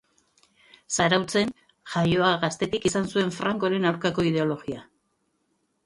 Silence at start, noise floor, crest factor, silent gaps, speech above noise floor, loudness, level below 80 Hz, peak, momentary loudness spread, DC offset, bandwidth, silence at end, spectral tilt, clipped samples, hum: 0.9 s; -73 dBFS; 20 dB; none; 48 dB; -25 LUFS; -56 dBFS; -6 dBFS; 8 LU; under 0.1%; 11.5 kHz; 1.05 s; -4.5 dB/octave; under 0.1%; none